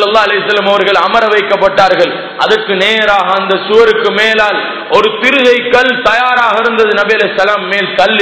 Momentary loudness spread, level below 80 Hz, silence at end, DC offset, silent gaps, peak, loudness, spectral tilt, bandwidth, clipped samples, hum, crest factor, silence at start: 4 LU; -46 dBFS; 0 s; 0.3%; none; 0 dBFS; -9 LUFS; -4 dB/octave; 8 kHz; 2%; none; 10 dB; 0 s